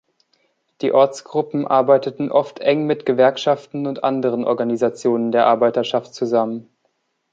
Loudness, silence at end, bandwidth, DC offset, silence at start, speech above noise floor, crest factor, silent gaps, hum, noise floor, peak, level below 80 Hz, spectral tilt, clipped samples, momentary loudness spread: -18 LUFS; 0.7 s; 7.8 kHz; under 0.1%; 0.8 s; 51 dB; 16 dB; none; none; -69 dBFS; -2 dBFS; -70 dBFS; -6 dB/octave; under 0.1%; 7 LU